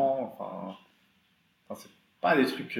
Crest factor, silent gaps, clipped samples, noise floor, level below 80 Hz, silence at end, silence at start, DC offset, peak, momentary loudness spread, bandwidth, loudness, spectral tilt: 20 dB; none; under 0.1%; -69 dBFS; -82 dBFS; 0 s; 0 s; under 0.1%; -12 dBFS; 20 LU; 16.5 kHz; -29 LUFS; -5.5 dB/octave